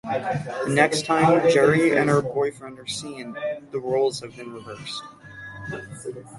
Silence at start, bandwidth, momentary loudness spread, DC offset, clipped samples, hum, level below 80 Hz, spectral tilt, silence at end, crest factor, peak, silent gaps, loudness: 0.05 s; 11.5 kHz; 19 LU; under 0.1%; under 0.1%; none; -60 dBFS; -5 dB/octave; 0 s; 20 dB; -2 dBFS; none; -22 LUFS